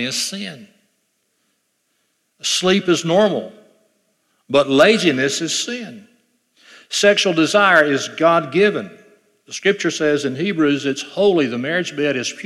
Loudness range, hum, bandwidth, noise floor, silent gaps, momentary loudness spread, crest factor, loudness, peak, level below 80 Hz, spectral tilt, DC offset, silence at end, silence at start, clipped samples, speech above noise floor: 4 LU; none; 14 kHz; -68 dBFS; none; 13 LU; 18 dB; -17 LUFS; 0 dBFS; -66 dBFS; -3.5 dB/octave; under 0.1%; 0 s; 0 s; under 0.1%; 51 dB